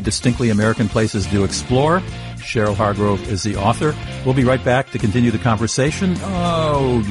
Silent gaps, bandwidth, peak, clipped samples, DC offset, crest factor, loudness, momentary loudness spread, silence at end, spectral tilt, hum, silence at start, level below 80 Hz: none; 11.5 kHz; -2 dBFS; under 0.1%; under 0.1%; 16 dB; -18 LUFS; 5 LU; 0 s; -5.5 dB/octave; none; 0 s; -34 dBFS